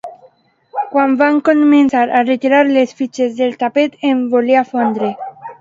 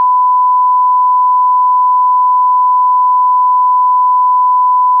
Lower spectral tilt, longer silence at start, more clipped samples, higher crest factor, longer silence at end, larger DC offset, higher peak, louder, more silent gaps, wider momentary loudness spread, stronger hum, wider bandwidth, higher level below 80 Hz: first, -5.5 dB/octave vs -1 dB/octave; about the same, 0.05 s vs 0 s; neither; first, 14 dB vs 4 dB; about the same, 0.05 s vs 0 s; neither; first, 0 dBFS vs -6 dBFS; second, -14 LUFS vs -9 LUFS; neither; first, 11 LU vs 0 LU; neither; first, 7.6 kHz vs 1.1 kHz; first, -64 dBFS vs under -90 dBFS